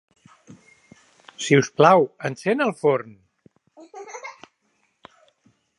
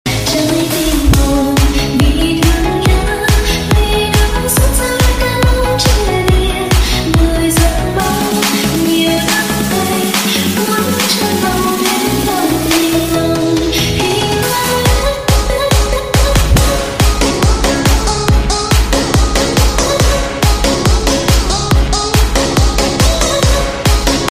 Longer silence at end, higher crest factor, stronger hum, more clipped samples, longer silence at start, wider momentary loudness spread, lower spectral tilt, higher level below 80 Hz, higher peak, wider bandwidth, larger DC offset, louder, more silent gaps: first, 1.5 s vs 0 s; first, 24 dB vs 12 dB; neither; neither; first, 1.4 s vs 0.05 s; first, 24 LU vs 2 LU; first, -5.5 dB/octave vs -4 dB/octave; second, -72 dBFS vs -16 dBFS; about the same, 0 dBFS vs 0 dBFS; second, 11.5 kHz vs 16 kHz; second, under 0.1% vs 0.5%; second, -20 LUFS vs -12 LUFS; neither